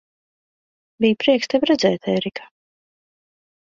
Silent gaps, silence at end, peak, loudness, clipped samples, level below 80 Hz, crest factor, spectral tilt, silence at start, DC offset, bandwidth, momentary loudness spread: none; 1.35 s; -4 dBFS; -19 LUFS; under 0.1%; -62 dBFS; 18 dB; -5 dB/octave; 1 s; under 0.1%; 7.6 kHz; 9 LU